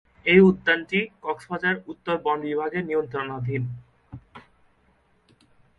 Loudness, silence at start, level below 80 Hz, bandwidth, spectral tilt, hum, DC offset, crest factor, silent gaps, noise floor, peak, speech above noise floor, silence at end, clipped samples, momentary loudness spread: -23 LUFS; 0.25 s; -58 dBFS; 5.2 kHz; -8 dB/octave; none; under 0.1%; 22 dB; none; -63 dBFS; -4 dBFS; 40 dB; 1.4 s; under 0.1%; 16 LU